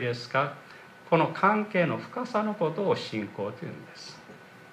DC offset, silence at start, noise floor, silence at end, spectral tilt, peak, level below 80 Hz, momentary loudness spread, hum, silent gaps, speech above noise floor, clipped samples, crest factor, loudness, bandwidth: under 0.1%; 0 s; -49 dBFS; 0 s; -6.5 dB/octave; -8 dBFS; -76 dBFS; 23 LU; none; none; 21 dB; under 0.1%; 22 dB; -28 LUFS; 13 kHz